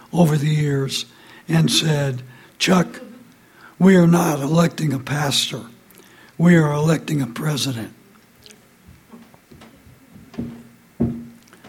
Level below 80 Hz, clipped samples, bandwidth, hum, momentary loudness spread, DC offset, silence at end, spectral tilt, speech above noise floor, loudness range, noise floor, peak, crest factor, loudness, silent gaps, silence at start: -52 dBFS; under 0.1%; 16 kHz; none; 19 LU; under 0.1%; 0 s; -5.5 dB/octave; 32 dB; 15 LU; -49 dBFS; -2 dBFS; 18 dB; -18 LUFS; none; 0.15 s